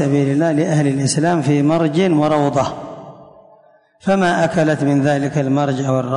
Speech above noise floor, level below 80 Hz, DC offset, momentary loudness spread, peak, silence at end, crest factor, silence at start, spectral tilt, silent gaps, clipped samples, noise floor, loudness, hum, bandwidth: 35 dB; -52 dBFS; under 0.1%; 5 LU; -4 dBFS; 0 s; 12 dB; 0 s; -6.5 dB/octave; none; under 0.1%; -51 dBFS; -16 LUFS; none; 11 kHz